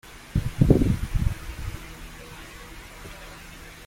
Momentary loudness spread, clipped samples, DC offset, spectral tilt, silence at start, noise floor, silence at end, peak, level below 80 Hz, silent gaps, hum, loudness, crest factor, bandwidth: 21 LU; under 0.1%; under 0.1%; -7.5 dB/octave; 0.05 s; -43 dBFS; 0 s; -2 dBFS; -32 dBFS; none; none; -25 LUFS; 24 dB; 16.5 kHz